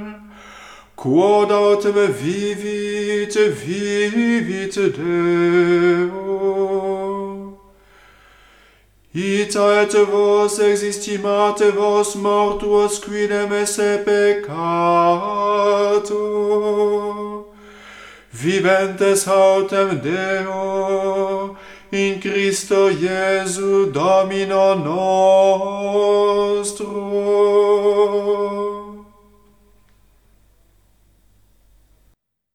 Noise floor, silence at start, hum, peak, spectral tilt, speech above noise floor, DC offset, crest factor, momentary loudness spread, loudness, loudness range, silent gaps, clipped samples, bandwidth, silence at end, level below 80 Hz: -61 dBFS; 0 s; none; -2 dBFS; -4.5 dB/octave; 44 dB; under 0.1%; 14 dB; 9 LU; -17 LUFS; 4 LU; none; under 0.1%; 14 kHz; 3.5 s; -54 dBFS